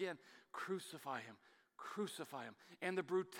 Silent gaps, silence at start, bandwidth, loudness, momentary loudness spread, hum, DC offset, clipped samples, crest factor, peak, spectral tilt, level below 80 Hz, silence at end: none; 0 s; 17 kHz; -47 LUFS; 14 LU; none; under 0.1%; under 0.1%; 20 dB; -26 dBFS; -4.5 dB/octave; under -90 dBFS; 0 s